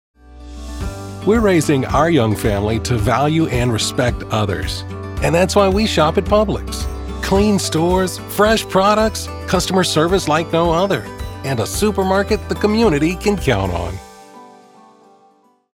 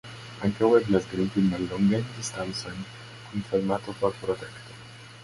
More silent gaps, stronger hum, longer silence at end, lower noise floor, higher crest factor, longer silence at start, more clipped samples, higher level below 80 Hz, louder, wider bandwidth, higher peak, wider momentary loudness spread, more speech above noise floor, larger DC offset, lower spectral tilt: neither; neither; first, 1.25 s vs 0 s; first, -54 dBFS vs -45 dBFS; about the same, 16 dB vs 20 dB; first, 0.25 s vs 0.05 s; neither; first, -30 dBFS vs -54 dBFS; first, -17 LUFS vs -27 LUFS; first, 16.5 kHz vs 11.5 kHz; first, -2 dBFS vs -8 dBFS; second, 11 LU vs 20 LU; first, 38 dB vs 19 dB; neither; about the same, -5 dB/octave vs -6 dB/octave